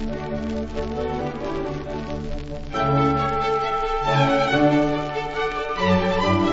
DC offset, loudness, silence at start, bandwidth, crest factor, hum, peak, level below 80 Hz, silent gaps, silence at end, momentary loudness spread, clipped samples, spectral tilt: under 0.1%; -23 LUFS; 0 s; 8 kHz; 16 dB; none; -6 dBFS; -36 dBFS; none; 0 s; 11 LU; under 0.1%; -6.5 dB/octave